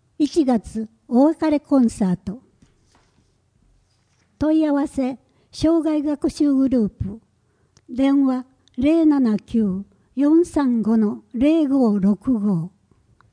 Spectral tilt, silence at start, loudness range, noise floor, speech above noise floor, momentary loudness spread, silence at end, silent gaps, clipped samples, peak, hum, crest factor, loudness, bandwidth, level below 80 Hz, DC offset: -7.5 dB/octave; 0.2 s; 6 LU; -62 dBFS; 44 dB; 14 LU; 0.65 s; none; under 0.1%; -6 dBFS; none; 14 dB; -20 LUFS; 10.5 kHz; -48 dBFS; under 0.1%